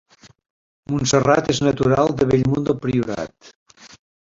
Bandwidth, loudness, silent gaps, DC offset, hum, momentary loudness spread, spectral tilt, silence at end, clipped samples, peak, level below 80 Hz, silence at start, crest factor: 7.8 kHz; -19 LUFS; 3.56-3.66 s; under 0.1%; none; 10 LU; -5.5 dB/octave; 0.35 s; under 0.1%; -2 dBFS; -46 dBFS; 0.9 s; 18 dB